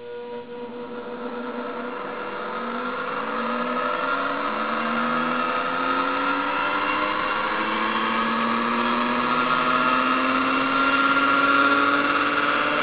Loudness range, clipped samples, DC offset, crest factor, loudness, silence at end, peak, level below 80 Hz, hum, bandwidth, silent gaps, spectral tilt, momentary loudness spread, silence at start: 9 LU; under 0.1%; 0.4%; 16 dB; -22 LUFS; 0 s; -8 dBFS; -56 dBFS; none; 4 kHz; none; -7.5 dB/octave; 12 LU; 0 s